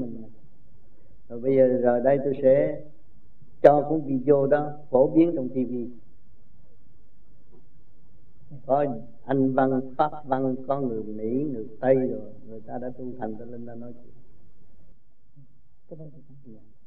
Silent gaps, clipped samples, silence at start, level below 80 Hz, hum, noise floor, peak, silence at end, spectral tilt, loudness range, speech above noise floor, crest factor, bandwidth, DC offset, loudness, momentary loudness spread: none; under 0.1%; 0 s; -60 dBFS; none; -59 dBFS; -2 dBFS; 0 s; -10.5 dB/octave; 17 LU; 35 dB; 24 dB; 4.4 kHz; 2%; -24 LUFS; 21 LU